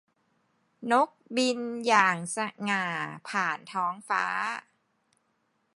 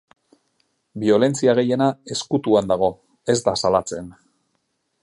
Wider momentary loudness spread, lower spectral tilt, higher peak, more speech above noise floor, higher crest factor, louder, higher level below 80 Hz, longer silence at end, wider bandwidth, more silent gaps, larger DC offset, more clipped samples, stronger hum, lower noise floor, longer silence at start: second, 10 LU vs 14 LU; second, -3.5 dB/octave vs -5 dB/octave; second, -8 dBFS vs -4 dBFS; second, 46 dB vs 52 dB; about the same, 22 dB vs 18 dB; second, -28 LUFS vs -20 LUFS; second, -84 dBFS vs -56 dBFS; first, 1.15 s vs 0.9 s; about the same, 11.5 kHz vs 11.5 kHz; neither; neither; neither; neither; about the same, -74 dBFS vs -72 dBFS; second, 0.8 s vs 0.95 s